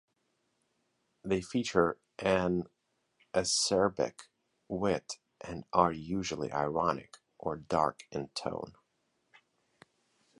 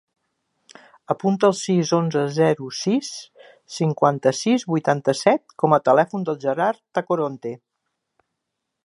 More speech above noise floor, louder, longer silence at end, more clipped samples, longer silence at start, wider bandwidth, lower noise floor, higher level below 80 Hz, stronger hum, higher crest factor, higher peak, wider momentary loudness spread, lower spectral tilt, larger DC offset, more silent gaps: second, 46 dB vs 60 dB; second, -32 LUFS vs -21 LUFS; first, 1.7 s vs 1.3 s; neither; first, 1.25 s vs 1.1 s; about the same, 11.5 kHz vs 11.5 kHz; about the same, -78 dBFS vs -80 dBFS; first, -60 dBFS vs -70 dBFS; neither; first, 26 dB vs 20 dB; second, -8 dBFS vs -2 dBFS; first, 14 LU vs 9 LU; second, -4 dB/octave vs -5.5 dB/octave; neither; neither